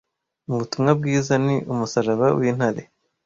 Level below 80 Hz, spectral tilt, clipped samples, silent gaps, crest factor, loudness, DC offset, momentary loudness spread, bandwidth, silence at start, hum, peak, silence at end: -58 dBFS; -6.5 dB/octave; under 0.1%; none; 18 dB; -21 LUFS; under 0.1%; 9 LU; 7.6 kHz; 0.5 s; none; -4 dBFS; 0.45 s